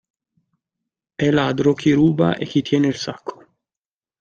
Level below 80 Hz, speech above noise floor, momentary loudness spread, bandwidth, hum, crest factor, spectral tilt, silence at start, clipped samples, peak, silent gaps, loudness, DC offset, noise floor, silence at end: -54 dBFS; over 72 dB; 16 LU; 7.4 kHz; none; 18 dB; -6.5 dB/octave; 1.2 s; under 0.1%; -4 dBFS; none; -18 LUFS; under 0.1%; under -90 dBFS; 0.85 s